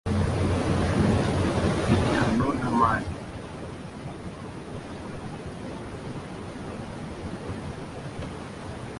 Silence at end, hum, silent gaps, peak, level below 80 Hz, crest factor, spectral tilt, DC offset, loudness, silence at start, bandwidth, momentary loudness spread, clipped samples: 0 s; none; none; -10 dBFS; -38 dBFS; 18 dB; -6.5 dB/octave; under 0.1%; -28 LUFS; 0.05 s; 11.5 kHz; 15 LU; under 0.1%